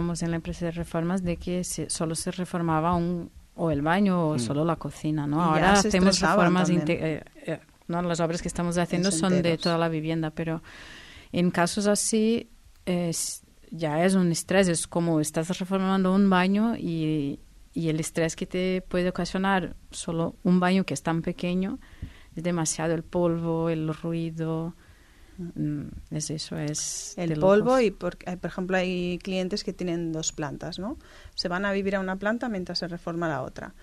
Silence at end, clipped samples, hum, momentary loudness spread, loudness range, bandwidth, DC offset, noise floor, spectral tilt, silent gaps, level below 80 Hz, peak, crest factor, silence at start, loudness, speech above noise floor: 0.1 s; under 0.1%; none; 13 LU; 6 LU; 13.5 kHz; under 0.1%; -52 dBFS; -5 dB/octave; none; -48 dBFS; -8 dBFS; 18 dB; 0 s; -26 LUFS; 26 dB